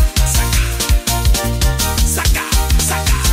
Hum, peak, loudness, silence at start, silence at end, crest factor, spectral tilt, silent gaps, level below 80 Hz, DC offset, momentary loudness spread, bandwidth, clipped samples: none; -2 dBFS; -15 LUFS; 0 s; 0 s; 12 dB; -3 dB/octave; none; -16 dBFS; under 0.1%; 2 LU; 16.5 kHz; under 0.1%